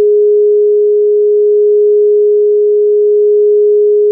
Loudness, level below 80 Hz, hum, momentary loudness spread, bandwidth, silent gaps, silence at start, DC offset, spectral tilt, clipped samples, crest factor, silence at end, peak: -9 LUFS; under -90 dBFS; none; 1 LU; 0.6 kHz; none; 0 s; under 0.1%; -1 dB/octave; under 0.1%; 4 dB; 0 s; -4 dBFS